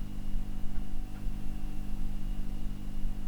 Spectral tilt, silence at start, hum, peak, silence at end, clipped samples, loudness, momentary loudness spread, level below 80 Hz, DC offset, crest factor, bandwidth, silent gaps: -6.5 dB/octave; 0 s; 50 Hz at -45 dBFS; -18 dBFS; 0 s; under 0.1%; -42 LUFS; 1 LU; -32 dBFS; 0.2%; 10 dB; 4 kHz; none